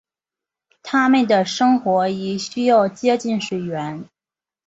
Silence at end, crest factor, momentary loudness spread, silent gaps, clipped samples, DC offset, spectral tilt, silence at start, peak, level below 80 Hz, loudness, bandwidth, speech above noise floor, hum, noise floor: 0.65 s; 16 dB; 11 LU; none; under 0.1%; under 0.1%; -5 dB/octave; 0.85 s; -4 dBFS; -64 dBFS; -19 LUFS; 8 kHz; over 72 dB; none; under -90 dBFS